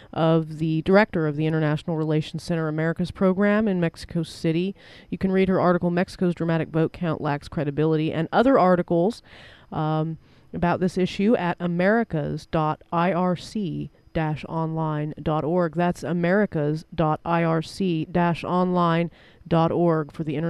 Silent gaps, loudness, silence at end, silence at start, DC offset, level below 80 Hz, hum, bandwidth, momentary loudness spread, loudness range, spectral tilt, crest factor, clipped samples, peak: none; -23 LUFS; 0 s; 0 s; under 0.1%; -50 dBFS; none; 11.5 kHz; 8 LU; 2 LU; -8 dB/octave; 20 dB; under 0.1%; -4 dBFS